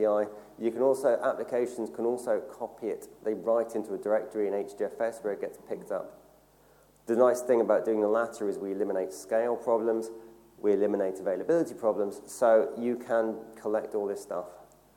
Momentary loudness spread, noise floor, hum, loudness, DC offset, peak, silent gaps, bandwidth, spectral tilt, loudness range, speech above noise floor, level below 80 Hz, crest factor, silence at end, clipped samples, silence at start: 12 LU; -61 dBFS; none; -30 LUFS; under 0.1%; -10 dBFS; none; 17 kHz; -6 dB/octave; 4 LU; 32 dB; -72 dBFS; 18 dB; 0.35 s; under 0.1%; 0 s